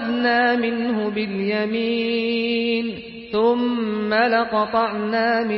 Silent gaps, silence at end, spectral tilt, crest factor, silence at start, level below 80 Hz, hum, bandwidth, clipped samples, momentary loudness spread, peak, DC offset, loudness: none; 0 s; -10 dB/octave; 14 dB; 0 s; -58 dBFS; none; 5.8 kHz; under 0.1%; 6 LU; -8 dBFS; under 0.1%; -21 LUFS